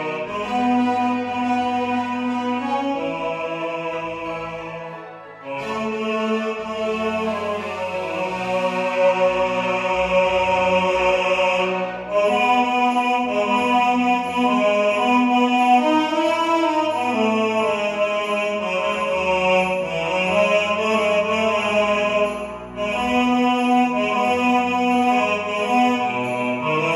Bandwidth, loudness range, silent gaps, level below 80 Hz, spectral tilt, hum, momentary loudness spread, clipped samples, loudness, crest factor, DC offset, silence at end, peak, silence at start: 12.5 kHz; 7 LU; none; -52 dBFS; -5 dB/octave; none; 8 LU; under 0.1%; -20 LUFS; 16 dB; under 0.1%; 0 s; -4 dBFS; 0 s